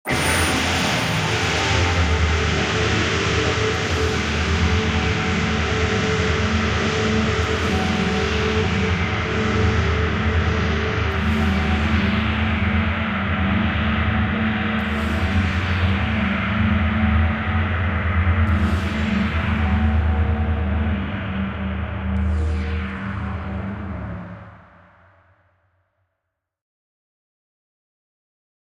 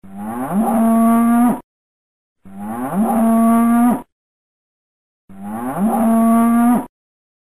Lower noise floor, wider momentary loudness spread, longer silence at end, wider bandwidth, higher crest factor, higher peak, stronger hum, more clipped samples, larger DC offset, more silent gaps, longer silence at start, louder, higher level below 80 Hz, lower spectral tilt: second, -79 dBFS vs under -90 dBFS; second, 6 LU vs 15 LU; first, 4.15 s vs 0.6 s; first, 15.5 kHz vs 13.5 kHz; about the same, 14 dB vs 10 dB; about the same, -6 dBFS vs -6 dBFS; neither; neither; second, under 0.1% vs 1%; second, none vs 1.64-2.36 s, 4.12-5.28 s; about the same, 0.05 s vs 0.05 s; second, -20 LUFS vs -15 LUFS; first, -30 dBFS vs -50 dBFS; second, -5.5 dB/octave vs -7 dB/octave